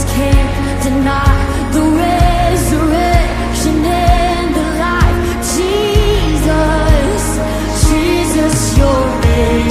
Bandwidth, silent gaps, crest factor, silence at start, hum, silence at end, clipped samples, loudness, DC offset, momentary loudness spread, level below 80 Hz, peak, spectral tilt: 15.5 kHz; none; 12 dB; 0 s; none; 0 s; under 0.1%; -13 LUFS; under 0.1%; 4 LU; -16 dBFS; 0 dBFS; -5.5 dB/octave